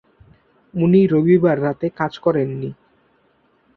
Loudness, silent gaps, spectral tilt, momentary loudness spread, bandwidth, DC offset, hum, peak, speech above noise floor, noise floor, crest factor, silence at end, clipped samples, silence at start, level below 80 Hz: -18 LUFS; none; -10 dB/octave; 14 LU; 6 kHz; under 0.1%; none; -4 dBFS; 43 dB; -60 dBFS; 16 dB; 1.05 s; under 0.1%; 0.75 s; -56 dBFS